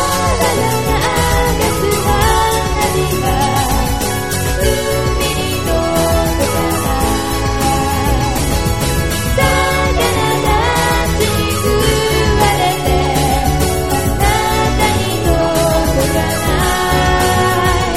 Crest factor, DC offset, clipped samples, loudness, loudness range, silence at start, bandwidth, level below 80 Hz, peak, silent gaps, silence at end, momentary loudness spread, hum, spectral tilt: 14 dB; 3%; under 0.1%; -14 LUFS; 2 LU; 0 s; 16 kHz; -22 dBFS; 0 dBFS; none; 0 s; 3 LU; none; -4.5 dB/octave